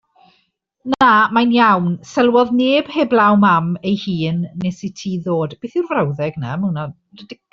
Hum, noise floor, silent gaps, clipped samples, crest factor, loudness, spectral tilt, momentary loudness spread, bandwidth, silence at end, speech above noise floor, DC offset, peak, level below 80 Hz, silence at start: none; -64 dBFS; none; under 0.1%; 14 dB; -16 LUFS; -6.5 dB/octave; 12 LU; 7.6 kHz; 0.2 s; 48 dB; under 0.1%; -2 dBFS; -56 dBFS; 0.85 s